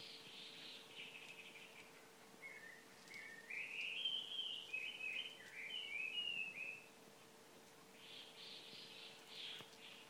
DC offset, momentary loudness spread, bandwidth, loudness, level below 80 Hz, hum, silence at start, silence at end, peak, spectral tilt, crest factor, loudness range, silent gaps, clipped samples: under 0.1%; 19 LU; 19 kHz; -48 LUFS; under -90 dBFS; none; 0 s; 0 s; -32 dBFS; -0.5 dB/octave; 20 dB; 11 LU; none; under 0.1%